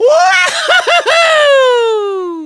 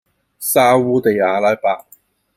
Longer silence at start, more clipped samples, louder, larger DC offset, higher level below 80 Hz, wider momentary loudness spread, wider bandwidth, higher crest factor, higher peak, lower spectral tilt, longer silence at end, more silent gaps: second, 0 s vs 0.4 s; neither; first, -9 LUFS vs -15 LUFS; neither; about the same, -60 dBFS vs -62 dBFS; second, 6 LU vs 10 LU; second, 11 kHz vs 16 kHz; about the same, 10 dB vs 14 dB; about the same, 0 dBFS vs -2 dBFS; second, 0 dB/octave vs -4.5 dB/octave; second, 0 s vs 0.6 s; neither